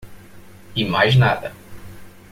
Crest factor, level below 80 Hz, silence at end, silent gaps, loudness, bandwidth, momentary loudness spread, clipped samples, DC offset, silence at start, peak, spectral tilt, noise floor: 18 dB; -46 dBFS; 0.2 s; none; -18 LUFS; 15 kHz; 13 LU; under 0.1%; under 0.1%; 0.05 s; -2 dBFS; -6.5 dB/octave; -41 dBFS